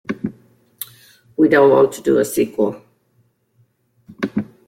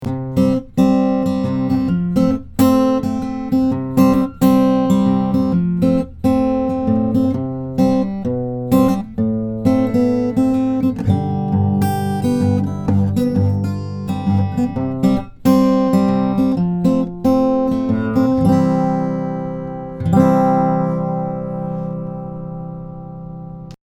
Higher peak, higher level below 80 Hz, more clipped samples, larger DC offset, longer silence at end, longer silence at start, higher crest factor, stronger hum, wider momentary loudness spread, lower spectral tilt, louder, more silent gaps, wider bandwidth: about the same, -2 dBFS vs 0 dBFS; second, -60 dBFS vs -40 dBFS; neither; neither; first, 0.25 s vs 0.1 s; about the same, 0.1 s vs 0 s; about the same, 16 dB vs 16 dB; neither; first, 21 LU vs 10 LU; second, -5.5 dB/octave vs -8.5 dB/octave; about the same, -17 LUFS vs -17 LUFS; neither; second, 16.5 kHz vs 19 kHz